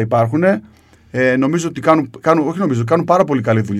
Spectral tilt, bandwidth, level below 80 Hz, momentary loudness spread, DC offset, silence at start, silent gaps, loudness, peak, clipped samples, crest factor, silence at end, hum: -7 dB/octave; 13 kHz; -54 dBFS; 4 LU; under 0.1%; 0 s; none; -15 LUFS; 0 dBFS; under 0.1%; 16 dB; 0 s; none